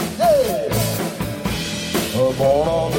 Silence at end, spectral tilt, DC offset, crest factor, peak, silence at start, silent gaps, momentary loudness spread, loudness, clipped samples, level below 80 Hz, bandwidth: 0 s; -5 dB/octave; under 0.1%; 14 dB; -4 dBFS; 0 s; none; 7 LU; -19 LUFS; under 0.1%; -38 dBFS; 17 kHz